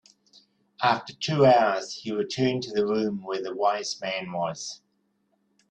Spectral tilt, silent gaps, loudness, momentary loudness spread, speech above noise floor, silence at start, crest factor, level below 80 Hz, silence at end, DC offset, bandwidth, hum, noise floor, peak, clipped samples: -5 dB/octave; none; -26 LUFS; 12 LU; 46 dB; 0.8 s; 20 dB; -68 dBFS; 0.95 s; under 0.1%; 9.2 kHz; none; -72 dBFS; -6 dBFS; under 0.1%